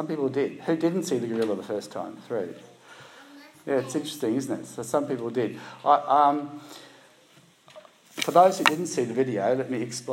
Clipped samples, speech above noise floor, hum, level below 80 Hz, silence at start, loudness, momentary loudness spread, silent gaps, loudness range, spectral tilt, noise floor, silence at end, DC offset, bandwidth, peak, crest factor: under 0.1%; 31 dB; none; -80 dBFS; 0 s; -26 LUFS; 18 LU; none; 6 LU; -4.5 dB/octave; -57 dBFS; 0 s; under 0.1%; 16 kHz; 0 dBFS; 26 dB